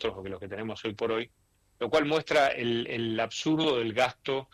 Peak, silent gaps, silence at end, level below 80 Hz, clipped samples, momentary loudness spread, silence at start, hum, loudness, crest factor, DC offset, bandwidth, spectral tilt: -12 dBFS; none; 0.1 s; -62 dBFS; under 0.1%; 12 LU; 0 s; none; -29 LUFS; 16 dB; under 0.1%; 14 kHz; -4.5 dB/octave